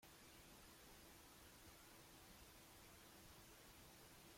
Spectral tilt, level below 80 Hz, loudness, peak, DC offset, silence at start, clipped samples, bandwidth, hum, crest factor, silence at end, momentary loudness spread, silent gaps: -2.5 dB/octave; -74 dBFS; -63 LUFS; -50 dBFS; under 0.1%; 0 s; under 0.1%; 16.5 kHz; none; 14 dB; 0 s; 0 LU; none